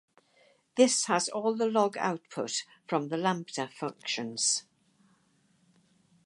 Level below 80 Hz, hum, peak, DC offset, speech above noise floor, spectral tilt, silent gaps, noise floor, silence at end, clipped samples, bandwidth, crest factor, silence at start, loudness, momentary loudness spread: -84 dBFS; none; -8 dBFS; under 0.1%; 39 dB; -3 dB/octave; none; -69 dBFS; 1.65 s; under 0.1%; 11.5 kHz; 22 dB; 0.75 s; -30 LUFS; 11 LU